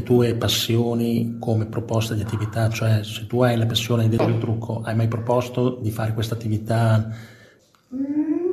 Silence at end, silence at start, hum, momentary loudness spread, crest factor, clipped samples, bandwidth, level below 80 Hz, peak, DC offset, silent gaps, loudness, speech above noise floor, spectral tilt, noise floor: 0 s; 0 s; none; 6 LU; 16 dB; under 0.1%; 14 kHz; -48 dBFS; -4 dBFS; under 0.1%; none; -22 LUFS; 32 dB; -6 dB/octave; -53 dBFS